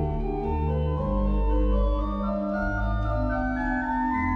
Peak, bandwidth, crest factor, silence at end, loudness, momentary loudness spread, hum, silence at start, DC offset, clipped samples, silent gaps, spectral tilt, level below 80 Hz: -14 dBFS; 4.8 kHz; 12 dB; 0 s; -27 LUFS; 3 LU; none; 0 s; under 0.1%; under 0.1%; none; -9.5 dB/octave; -28 dBFS